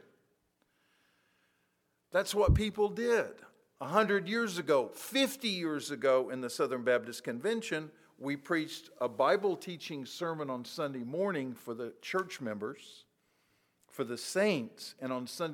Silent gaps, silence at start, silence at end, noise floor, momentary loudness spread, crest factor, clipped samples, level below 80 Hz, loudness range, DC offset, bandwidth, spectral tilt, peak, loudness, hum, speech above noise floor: none; 2.1 s; 0 s; -78 dBFS; 12 LU; 22 dB; under 0.1%; -48 dBFS; 6 LU; under 0.1%; 19 kHz; -5 dB/octave; -12 dBFS; -33 LUFS; none; 45 dB